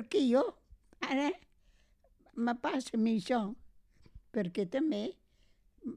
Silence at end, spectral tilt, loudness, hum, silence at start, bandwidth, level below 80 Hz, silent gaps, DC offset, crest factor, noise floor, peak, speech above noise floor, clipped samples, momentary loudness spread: 0 s; -5.5 dB/octave; -34 LUFS; none; 0 s; 11 kHz; -66 dBFS; none; under 0.1%; 18 dB; -67 dBFS; -16 dBFS; 35 dB; under 0.1%; 14 LU